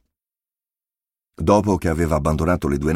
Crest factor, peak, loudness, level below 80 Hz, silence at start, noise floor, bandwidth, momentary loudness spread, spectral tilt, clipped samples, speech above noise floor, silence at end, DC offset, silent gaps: 18 dB; -4 dBFS; -20 LUFS; -34 dBFS; 1.4 s; under -90 dBFS; 15.5 kHz; 4 LU; -7 dB/octave; under 0.1%; over 72 dB; 0 s; under 0.1%; none